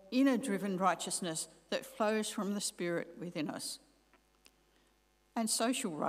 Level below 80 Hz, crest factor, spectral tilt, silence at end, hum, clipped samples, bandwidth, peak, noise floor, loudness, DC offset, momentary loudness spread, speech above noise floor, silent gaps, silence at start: -76 dBFS; 20 dB; -3.5 dB/octave; 0 s; 50 Hz at -75 dBFS; under 0.1%; 16 kHz; -16 dBFS; -72 dBFS; -35 LUFS; under 0.1%; 10 LU; 37 dB; none; 0.05 s